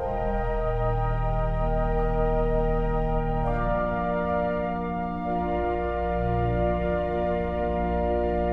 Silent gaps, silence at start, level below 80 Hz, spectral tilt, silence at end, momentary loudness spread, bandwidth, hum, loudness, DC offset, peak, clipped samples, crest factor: none; 0 s; -30 dBFS; -10 dB/octave; 0 s; 3 LU; 4.5 kHz; none; -27 LUFS; under 0.1%; -12 dBFS; under 0.1%; 12 dB